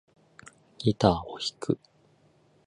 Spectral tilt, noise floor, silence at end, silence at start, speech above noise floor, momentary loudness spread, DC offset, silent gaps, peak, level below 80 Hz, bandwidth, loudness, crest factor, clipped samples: -6 dB/octave; -63 dBFS; 0.9 s; 0.8 s; 36 dB; 9 LU; under 0.1%; none; -6 dBFS; -52 dBFS; 11 kHz; -28 LUFS; 26 dB; under 0.1%